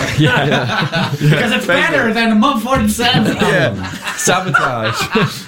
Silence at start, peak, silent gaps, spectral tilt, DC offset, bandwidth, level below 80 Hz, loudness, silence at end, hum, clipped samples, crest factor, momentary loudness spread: 0 s; -2 dBFS; none; -4.5 dB/octave; under 0.1%; 17 kHz; -38 dBFS; -14 LUFS; 0 s; none; under 0.1%; 12 dB; 5 LU